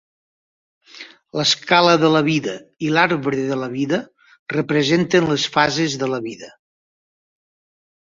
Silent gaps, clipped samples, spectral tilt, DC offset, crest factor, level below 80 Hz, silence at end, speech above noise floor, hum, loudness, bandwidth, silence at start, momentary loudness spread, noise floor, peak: 4.39-4.46 s; under 0.1%; -4.5 dB/octave; under 0.1%; 18 dB; -60 dBFS; 1.5 s; 24 dB; none; -18 LUFS; 7.8 kHz; 0.95 s; 16 LU; -42 dBFS; -2 dBFS